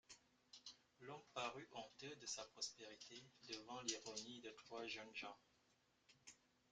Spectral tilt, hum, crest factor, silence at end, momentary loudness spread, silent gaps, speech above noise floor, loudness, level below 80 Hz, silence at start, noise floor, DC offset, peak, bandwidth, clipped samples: -1.5 dB/octave; none; 26 dB; 0.35 s; 17 LU; none; 27 dB; -53 LUFS; -88 dBFS; 0.1 s; -81 dBFS; under 0.1%; -30 dBFS; 9.6 kHz; under 0.1%